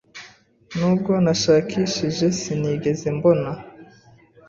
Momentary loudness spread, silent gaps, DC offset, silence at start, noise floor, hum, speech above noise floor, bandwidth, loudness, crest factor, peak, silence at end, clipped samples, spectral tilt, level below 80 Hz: 14 LU; none; under 0.1%; 0.15 s; -51 dBFS; none; 31 dB; 7.8 kHz; -21 LUFS; 18 dB; -4 dBFS; 0.65 s; under 0.1%; -5.5 dB/octave; -54 dBFS